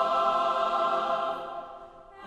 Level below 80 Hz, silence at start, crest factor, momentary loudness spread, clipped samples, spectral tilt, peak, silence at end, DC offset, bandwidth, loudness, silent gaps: -62 dBFS; 0 s; 14 dB; 17 LU; under 0.1%; -3.5 dB/octave; -14 dBFS; 0 s; under 0.1%; 11 kHz; -27 LUFS; none